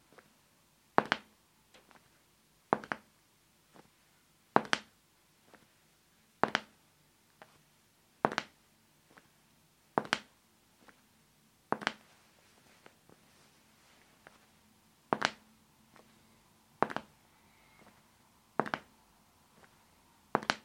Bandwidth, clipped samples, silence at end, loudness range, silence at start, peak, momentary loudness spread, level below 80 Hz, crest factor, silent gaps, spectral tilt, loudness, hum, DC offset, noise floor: 16.5 kHz; under 0.1%; 0.05 s; 7 LU; 1 s; -4 dBFS; 27 LU; -78 dBFS; 38 dB; none; -3.5 dB/octave; -36 LUFS; none; under 0.1%; -69 dBFS